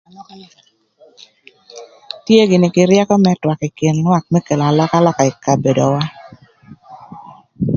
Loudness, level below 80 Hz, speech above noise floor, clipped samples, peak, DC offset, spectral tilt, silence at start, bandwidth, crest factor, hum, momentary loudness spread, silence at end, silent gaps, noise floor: -14 LUFS; -52 dBFS; 32 dB; under 0.1%; 0 dBFS; under 0.1%; -6.5 dB/octave; 0.2 s; 7.4 kHz; 16 dB; none; 12 LU; 0 s; none; -45 dBFS